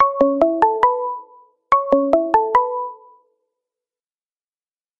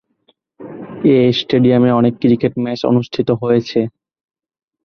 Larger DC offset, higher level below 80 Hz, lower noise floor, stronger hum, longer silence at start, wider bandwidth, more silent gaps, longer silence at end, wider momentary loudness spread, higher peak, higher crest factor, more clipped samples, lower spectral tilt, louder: neither; about the same, -54 dBFS vs -54 dBFS; first, under -90 dBFS vs -60 dBFS; neither; second, 0 s vs 0.6 s; first, 7.6 kHz vs 6.6 kHz; neither; first, 2.05 s vs 0.95 s; about the same, 12 LU vs 11 LU; about the same, 0 dBFS vs -2 dBFS; first, 20 dB vs 14 dB; neither; second, -6.5 dB/octave vs -8 dB/octave; about the same, -17 LUFS vs -15 LUFS